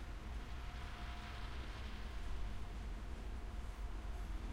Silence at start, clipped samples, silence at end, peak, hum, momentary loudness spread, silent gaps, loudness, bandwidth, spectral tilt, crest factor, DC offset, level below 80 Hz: 0 s; under 0.1%; 0 s; -32 dBFS; none; 1 LU; none; -49 LUFS; 14 kHz; -5.5 dB/octave; 12 dB; under 0.1%; -46 dBFS